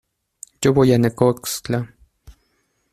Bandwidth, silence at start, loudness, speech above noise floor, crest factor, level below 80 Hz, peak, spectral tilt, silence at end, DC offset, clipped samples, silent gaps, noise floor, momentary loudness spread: 15 kHz; 0.6 s; -18 LUFS; 50 dB; 20 dB; -50 dBFS; 0 dBFS; -6 dB/octave; 1.05 s; under 0.1%; under 0.1%; none; -67 dBFS; 11 LU